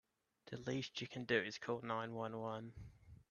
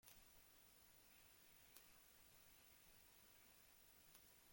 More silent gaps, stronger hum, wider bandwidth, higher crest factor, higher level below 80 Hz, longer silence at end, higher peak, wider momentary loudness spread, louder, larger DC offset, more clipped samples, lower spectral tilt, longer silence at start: neither; neither; second, 7.2 kHz vs 16.5 kHz; second, 22 dB vs 32 dB; first, -72 dBFS vs -84 dBFS; about the same, 0.1 s vs 0 s; first, -22 dBFS vs -38 dBFS; first, 16 LU vs 2 LU; first, -43 LUFS vs -67 LUFS; neither; neither; first, -5 dB/octave vs -1.5 dB/octave; first, 0.45 s vs 0 s